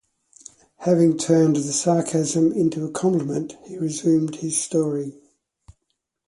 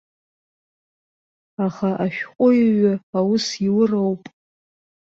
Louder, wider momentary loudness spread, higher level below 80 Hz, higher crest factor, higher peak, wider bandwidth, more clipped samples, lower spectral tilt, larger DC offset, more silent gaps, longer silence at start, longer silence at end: about the same, -21 LUFS vs -20 LUFS; about the same, 11 LU vs 10 LU; about the same, -62 dBFS vs -64 dBFS; about the same, 18 dB vs 16 dB; about the same, -4 dBFS vs -6 dBFS; first, 11.5 kHz vs 7.8 kHz; neither; about the same, -6 dB/octave vs -6 dB/octave; neither; second, none vs 3.03-3.13 s; second, 0.8 s vs 1.6 s; second, 0.55 s vs 0.9 s